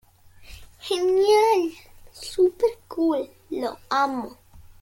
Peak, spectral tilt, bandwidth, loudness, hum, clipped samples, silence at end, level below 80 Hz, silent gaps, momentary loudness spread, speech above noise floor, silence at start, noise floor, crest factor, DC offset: -8 dBFS; -3.5 dB/octave; 16.5 kHz; -23 LUFS; none; under 0.1%; 0.2 s; -54 dBFS; none; 15 LU; 25 dB; 0.4 s; -48 dBFS; 16 dB; under 0.1%